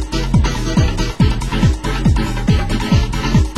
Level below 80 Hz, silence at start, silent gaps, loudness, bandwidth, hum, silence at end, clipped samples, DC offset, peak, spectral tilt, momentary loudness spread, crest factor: -18 dBFS; 0 s; none; -16 LUFS; 16 kHz; none; 0 s; under 0.1%; 0.8%; -2 dBFS; -6 dB/octave; 1 LU; 14 dB